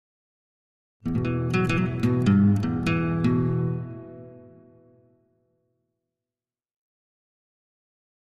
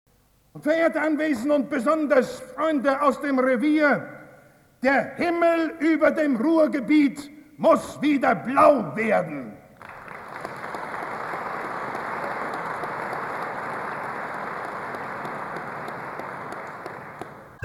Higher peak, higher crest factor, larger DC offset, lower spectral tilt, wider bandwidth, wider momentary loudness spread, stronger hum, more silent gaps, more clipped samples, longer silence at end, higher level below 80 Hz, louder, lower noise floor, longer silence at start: second, -10 dBFS vs -4 dBFS; about the same, 18 dB vs 20 dB; neither; first, -8 dB/octave vs -6 dB/octave; second, 11.5 kHz vs 13 kHz; about the same, 17 LU vs 16 LU; neither; neither; neither; first, 3.9 s vs 0.05 s; first, -50 dBFS vs -64 dBFS; about the same, -24 LUFS vs -24 LUFS; first, under -90 dBFS vs -53 dBFS; first, 1.05 s vs 0.55 s